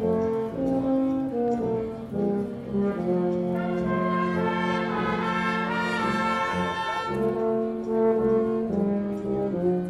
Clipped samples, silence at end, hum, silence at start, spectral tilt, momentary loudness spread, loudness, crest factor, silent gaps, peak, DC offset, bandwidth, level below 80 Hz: under 0.1%; 0 s; none; 0 s; -7.5 dB/octave; 4 LU; -26 LUFS; 12 dB; none; -12 dBFS; under 0.1%; 12 kHz; -52 dBFS